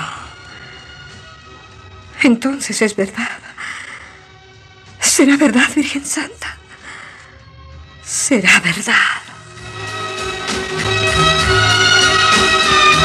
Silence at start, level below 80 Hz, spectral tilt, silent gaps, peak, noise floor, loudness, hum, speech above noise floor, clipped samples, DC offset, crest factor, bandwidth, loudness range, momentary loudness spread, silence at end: 0 s; -40 dBFS; -2.5 dB/octave; none; 0 dBFS; -42 dBFS; -13 LUFS; none; 27 dB; under 0.1%; under 0.1%; 16 dB; 14.5 kHz; 7 LU; 24 LU; 0 s